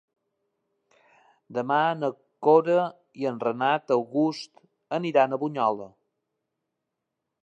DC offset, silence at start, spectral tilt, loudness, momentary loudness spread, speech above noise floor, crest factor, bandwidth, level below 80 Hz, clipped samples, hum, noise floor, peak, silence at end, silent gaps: under 0.1%; 1.5 s; -6.5 dB/octave; -25 LUFS; 13 LU; 59 dB; 20 dB; 8.6 kHz; -82 dBFS; under 0.1%; none; -83 dBFS; -6 dBFS; 1.55 s; none